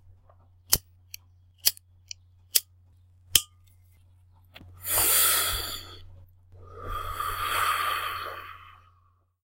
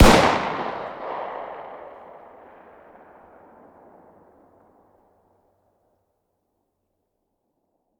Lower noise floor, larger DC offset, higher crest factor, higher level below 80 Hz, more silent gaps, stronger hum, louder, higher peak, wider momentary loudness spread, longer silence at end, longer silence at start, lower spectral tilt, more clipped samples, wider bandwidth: second, -65 dBFS vs -75 dBFS; neither; about the same, 30 dB vs 26 dB; second, -50 dBFS vs -34 dBFS; neither; neither; about the same, -25 LUFS vs -23 LUFS; about the same, 0 dBFS vs 0 dBFS; second, 25 LU vs 30 LU; second, 0.7 s vs 6.1 s; about the same, 0.05 s vs 0 s; second, 0 dB/octave vs -5 dB/octave; neither; second, 16 kHz vs 20 kHz